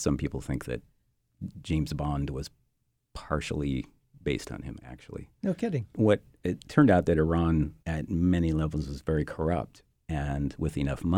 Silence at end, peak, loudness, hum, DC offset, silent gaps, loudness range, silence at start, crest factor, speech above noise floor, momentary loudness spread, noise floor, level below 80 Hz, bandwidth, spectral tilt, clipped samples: 0 s; -8 dBFS; -29 LUFS; none; under 0.1%; none; 9 LU; 0 s; 20 dB; 47 dB; 17 LU; -76 dBFS; -42 dBFS; 14 kHz; -7.5 dB/octave; under 0.1%